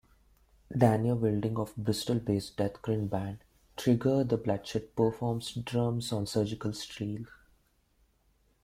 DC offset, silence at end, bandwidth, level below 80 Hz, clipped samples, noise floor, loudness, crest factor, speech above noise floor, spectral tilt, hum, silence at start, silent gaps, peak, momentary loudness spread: under 0.1%; 1.35 s; 16 kHz; -58 dBFS; under 0.1%; -70 dBFS; -31 LUFS; 22 dB; 39 dB; -6.5 dB/octave; none; 0.7 s; none; -8 dBFS; 11 LU